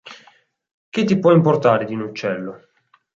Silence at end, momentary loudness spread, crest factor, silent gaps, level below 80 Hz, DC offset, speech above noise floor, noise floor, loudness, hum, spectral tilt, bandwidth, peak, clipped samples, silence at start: 0.65 s; 14 LU; 18 dB; 0.74-0.92 s; -62 dBFS; under 0.1%; 38 dB; -55 dBFS; -18 LUFS; none; -7.5 dB/octave; 7.6 kHz; -2 dBFS; under 0.1%; 0.05 s